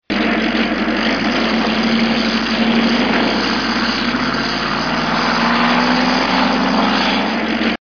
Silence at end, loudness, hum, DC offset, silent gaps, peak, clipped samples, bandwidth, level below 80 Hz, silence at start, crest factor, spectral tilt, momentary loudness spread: 0.05 s; -15 LUFS; none; 0.6%; none; -4 dBFS; under 0.1%; 5.4 kHz; -40 dBFS; 0.1 s; 12 dB; -4.5 dB/octave; 3 LU